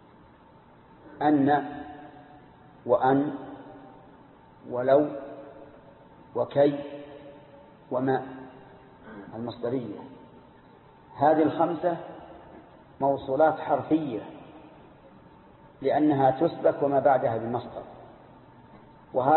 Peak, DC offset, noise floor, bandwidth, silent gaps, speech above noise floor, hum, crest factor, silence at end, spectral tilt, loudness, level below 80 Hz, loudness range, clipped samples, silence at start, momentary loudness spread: -10 dBFS; under 0.1%; -54 dBFS; 4.3 kHz; none; 29 dB; none; 20 dB; 0 s; -11 dB/octave; -26 LUFS; -64 dBFS; 6 LU; under 0.1%; 1.05 s; 24 LU